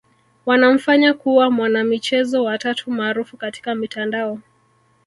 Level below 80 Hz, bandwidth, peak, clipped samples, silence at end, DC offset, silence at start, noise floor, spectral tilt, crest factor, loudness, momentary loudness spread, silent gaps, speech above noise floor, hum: -66 dBFS; 11.5 kHz; -2 dBFS; under 0.1%; 0.65 s; under 0.1%; 0.45 s; -59 dBFS; -4.5 dB/octave; 16 dB; -18 LUFS; 13 LU; none; 41 dB; none